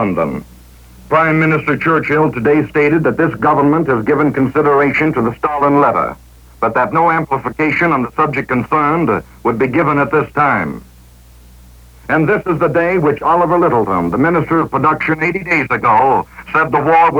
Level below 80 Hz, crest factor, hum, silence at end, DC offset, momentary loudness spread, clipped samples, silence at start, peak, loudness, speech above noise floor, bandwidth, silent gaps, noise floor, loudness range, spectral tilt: -42 dBFS; 12 dB; none; 0 s; under 0.1%; 6 LU; under 0.1%; 0 s; -2 dBFS; -14 LUFS; 28 dB; 20 kHz; none; -41 dBFS; 3 LU; -8.5 dB/octave